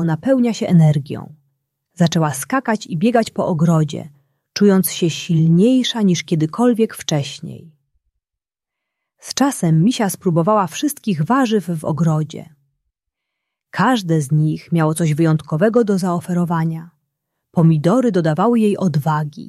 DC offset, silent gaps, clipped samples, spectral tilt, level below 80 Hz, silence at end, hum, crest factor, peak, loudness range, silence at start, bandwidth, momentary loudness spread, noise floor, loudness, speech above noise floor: under 0.1%; none; under 0.1%; -6.5 dB/octave; -60 dBFS; 0 s; none; 16 dB; -2 dBFS; 5 LU; 0 s; 14 kHz; 8 LU; -86 dBFS; -17 LUFS; 70 dB